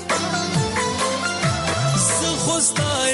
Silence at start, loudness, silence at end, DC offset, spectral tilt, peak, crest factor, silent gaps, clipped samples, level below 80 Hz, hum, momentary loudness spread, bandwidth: 0 s; -20 LUFS; 0 s; under 0.1%; -3 dB/octave; -8 dBFS; 14 dB; none; under 0.1%; -44 dBFS; none; 4 LU; 11.5 kHz